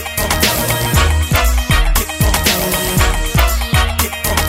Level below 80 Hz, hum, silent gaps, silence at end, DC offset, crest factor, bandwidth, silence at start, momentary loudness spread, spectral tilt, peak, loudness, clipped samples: -18 dBFS; none; none; 0 s; under 0.1%; 14 dB; 16.5 kHz; 0 s; 2 LU; -3.5 dB/octave; 0 dBFS; -14 LUFS; under 0.1%